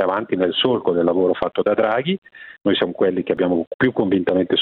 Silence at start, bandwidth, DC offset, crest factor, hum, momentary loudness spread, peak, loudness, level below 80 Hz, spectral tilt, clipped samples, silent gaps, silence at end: 0 s; 4.6 kHz; under 0.1%; 16 dB; none; 3 LU; -2 dBFS; -19 LUFS; -56 dBFS; -9 dB/octave; under 0.1%; 2.18-2.22 s, 3.67-3.79 s; 0 s